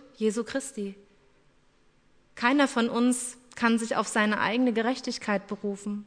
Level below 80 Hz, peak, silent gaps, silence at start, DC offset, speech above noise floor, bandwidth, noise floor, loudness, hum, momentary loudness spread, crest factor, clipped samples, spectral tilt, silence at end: -68 dBFS; -8 dBFS; none; 0.2 s; under 0.1%; 35 dB; 11 kHz; -63 dBFS; -27 LUFS; none; 10 LU; 20 dB; under 0.1%; -4 dB/octave; 0 s